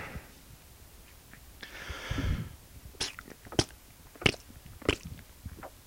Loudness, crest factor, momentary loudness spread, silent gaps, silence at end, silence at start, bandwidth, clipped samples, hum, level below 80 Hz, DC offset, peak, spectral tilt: -34 LUFS; 32 dB; 23 LU; none; 0 s; 0 s; 17 kHz; under 0.1%; none; -46 dBFS; under 0.1%; -4 dBFS; -4 dB/octave